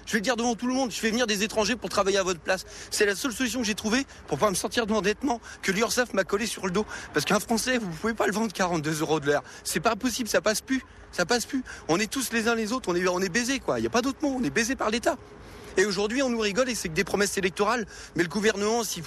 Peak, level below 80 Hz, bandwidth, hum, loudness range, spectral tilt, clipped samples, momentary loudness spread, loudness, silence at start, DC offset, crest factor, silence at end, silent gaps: -12 dBFS; -52 dBFS; 13.5 kHz; none; 1 LU; -3.5 dB/octave; under 0.1%; 5 LU; -26 LUFS; 0 s; under 0.1%; 16 dB; 0 s; none